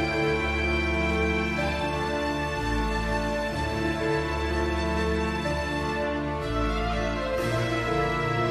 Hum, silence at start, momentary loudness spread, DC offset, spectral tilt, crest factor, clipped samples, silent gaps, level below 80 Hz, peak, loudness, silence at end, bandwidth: none; 0 s; 3 LU; under 0.1%; -6 dB/octave; 14 dB; under 0.1%; none; -34 dBFS; -14 dBFS; -27 LUFS; 0 s; 13.5 kHz